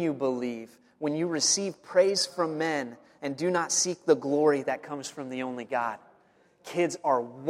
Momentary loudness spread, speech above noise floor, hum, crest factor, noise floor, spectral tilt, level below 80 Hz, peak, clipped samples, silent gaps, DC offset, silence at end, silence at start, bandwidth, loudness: 12 LU; 35 dB; none; 20 dB; -63 dBFS; -3 dB/octave; -78 dBFS; -10 dBFS; under 0.1%; none; under 0.1%; 0 s; 0 s; 14.5 kHz; -28 LUFS